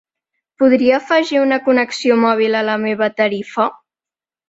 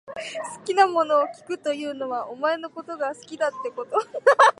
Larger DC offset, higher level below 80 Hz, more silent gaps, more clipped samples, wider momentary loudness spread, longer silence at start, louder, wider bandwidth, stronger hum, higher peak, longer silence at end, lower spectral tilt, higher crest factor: neither; first, -62 dBFS vs -78 dBFS; neither; neither; second, 5 LU vs 13 LU; first, 0.6 s vs 0.05 s; first, -15 LUFS vs -24 LUFS; second, 8 kHz vs 11.5 kHz; neither; about the same, -2 dBFS vs -4 dBFS; first, 0.75 s vs 0.05 s; first, -5 dB/octave vs -2.5 dB/octave; second, 14 dB vs 20 dB